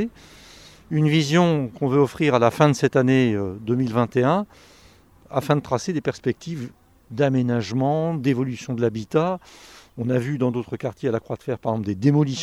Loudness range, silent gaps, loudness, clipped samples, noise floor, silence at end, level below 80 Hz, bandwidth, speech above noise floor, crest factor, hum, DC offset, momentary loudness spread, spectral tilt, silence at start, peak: 6 LU; none; -22 LUFS; under 0.1%; -52 dBFS; 0 s; -56 dBFS; 13.5 kHz; 31 dB; 20 dB; none; under 0.1%; 12 LU; -7 dB/octave; 0 s; -2 dBFS